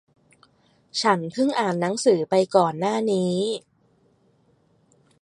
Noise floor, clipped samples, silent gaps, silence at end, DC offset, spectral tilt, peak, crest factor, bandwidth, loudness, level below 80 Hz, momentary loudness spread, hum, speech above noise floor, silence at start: -62 dBFS; under 0.1%; none; 1.65 s; under 0.1%; -5 dB/octave; -2 dBFS; 22 dB; 11.5 kHz; -22 LUFS; -72 dBFS; 6 LU; none; 41 dB; 0.95 s